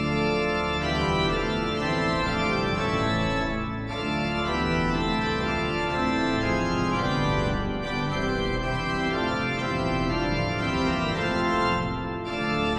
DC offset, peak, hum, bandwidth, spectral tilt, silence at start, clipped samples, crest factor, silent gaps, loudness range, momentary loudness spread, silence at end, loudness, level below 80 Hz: under 0.1%; -12 dBFS; none; 11 kHz; -6 dB/octave; 0 s; under 0.1%; 12 dB; none; 1 LU; 3 LU; 0 s; -26 LUFS; -38 dBFS